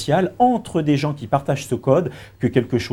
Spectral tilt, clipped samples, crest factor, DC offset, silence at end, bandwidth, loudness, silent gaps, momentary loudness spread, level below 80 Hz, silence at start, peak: -7 dB/octave; under 0.1%; 18 dB; under 0.1%; 0 s; 16.5 kHz; -20 LUFS; none; 5 LU; -50 dBFS; 0 s; -2 dBFS